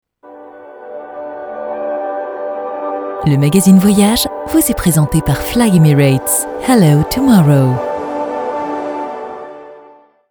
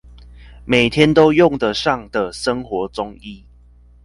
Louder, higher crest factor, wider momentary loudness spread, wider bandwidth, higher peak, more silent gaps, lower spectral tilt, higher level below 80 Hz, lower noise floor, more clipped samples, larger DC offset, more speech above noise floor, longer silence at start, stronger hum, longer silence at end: first, -13 LUFS vs -16 LUFS; about the same, 14 dB vs 18 dB; about the same, 18 LU vs 18 LU; first, over 20 kHz vs 11.5 kHz; about the same, 0 dBFS vs 0 dBFS; neither; about the same, -6 dB/octave vs -5.5 dB/octave; first, -36 dBFS vs -42 dBFS; second, -43 dBFS vs -47 dBFS; neither; neither; about the same, 33 dB vs 30 dB; second, 0.25 s vs 0.45 s; second, none vs 60 Hz at -40 dBFS; second, 0.5 s vs 0.65 s